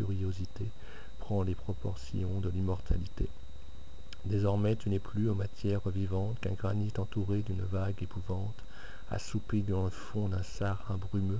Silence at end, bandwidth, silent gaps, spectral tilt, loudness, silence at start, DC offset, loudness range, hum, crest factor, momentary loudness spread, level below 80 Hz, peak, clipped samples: 0 s; 8 kHz; none; -8 dB/octave; -35 LUFS; 0 s; 2%; 3 LU; none; 18 dB; 17 LU; -44 dBFS; -16 dBFS; under 0.1%